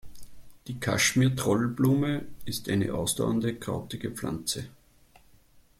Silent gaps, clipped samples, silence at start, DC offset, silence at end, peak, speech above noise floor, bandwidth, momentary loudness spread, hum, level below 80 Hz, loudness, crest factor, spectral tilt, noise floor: none; under 0.1%; 0.05 s; under 0.1%; 0.2 s; -12 dBFS; 31 dB; 16 kHz; 12 LU; none; -54 dBFS; -28 LUFS; 16 dB; -4.5 dB/octave; -58 dBFS